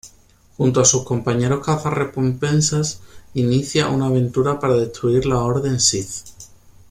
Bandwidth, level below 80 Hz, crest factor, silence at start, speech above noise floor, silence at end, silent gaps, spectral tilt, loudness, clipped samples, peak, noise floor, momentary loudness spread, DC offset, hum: 14.5 kHz; -44 dBFS; 18 dB; 0.05 s; 32 dB; 0.45 s; none; -4.5 dB/octave; -19 LUFS; under 0.1%; -2 dBFS; -51 dBFS; 8 LU; under 0.1%; none